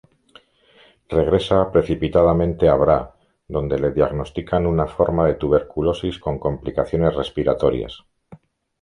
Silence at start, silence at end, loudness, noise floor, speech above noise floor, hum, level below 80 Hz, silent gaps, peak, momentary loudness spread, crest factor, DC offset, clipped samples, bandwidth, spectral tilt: 1.1 s; 0.45 s; -20 LUFS; -54 dBFS; 35 dB; none; -36 dBFS; none; -2 dBFS; 8 LU; 18 dB; under 0.1%; under 0.1%; 10.5 kHz; -8.5 dB/octave